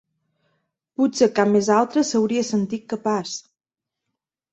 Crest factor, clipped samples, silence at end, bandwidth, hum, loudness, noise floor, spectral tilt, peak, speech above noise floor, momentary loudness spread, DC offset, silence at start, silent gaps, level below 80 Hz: 18 dB; under 0.1%; 1.1 s; 8.2 kHz; none; -21 LUFS; -87 dBFS; -5 dB/octave; -4 dBFS; 67 dB; 11 LU; under 0.1%; 1 s; none; -66 dBFS